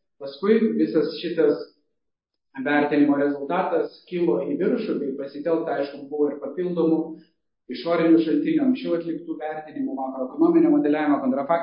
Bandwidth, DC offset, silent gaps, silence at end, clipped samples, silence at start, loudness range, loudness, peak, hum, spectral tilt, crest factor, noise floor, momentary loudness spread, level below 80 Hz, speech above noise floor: 5.4 kHz; under 0.1%; none; 0 s; under 0.1%; 0.2 s; 3 LU; -23 LUFS; -6 dBFS; none; -11 dB/octave; 16 dB; -81 dBFS; 12 LU; -74 dBFS; 59 dB